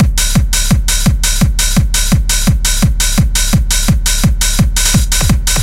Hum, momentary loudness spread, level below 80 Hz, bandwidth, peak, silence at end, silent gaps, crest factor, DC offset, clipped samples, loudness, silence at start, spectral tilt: none; 1 LU; -14 dBFS; 16.5 kHz; 0 dBFS; 0 s; none; 10 dB; under 0.1%; under 0.1%; -12 LUFS; 0 s; -3.5 dB/octave